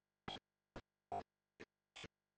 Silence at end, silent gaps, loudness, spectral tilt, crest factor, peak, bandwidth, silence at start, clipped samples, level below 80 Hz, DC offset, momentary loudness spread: 0.3 s; none; -55 LUFS; -4 dB/octave; 24 dB; -32 dBFS; 9.4 kHz; 0.25 s; under 0.1%; -74 dBFS; under 0.1%; 13 LU